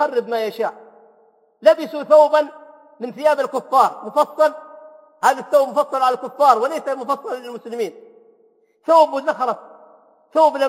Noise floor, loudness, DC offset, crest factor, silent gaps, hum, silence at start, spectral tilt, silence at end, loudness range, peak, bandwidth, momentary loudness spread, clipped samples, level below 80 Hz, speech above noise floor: -58 dBFS; -18 LUFS; under 0.1%; 18 dB; none; none; 0 s; -3.5 dB/octave; 0 s; 4 LU; 0 dBFS; 16 kHz; 14 LU; under 0.1%; -78 dBFS; 41 dB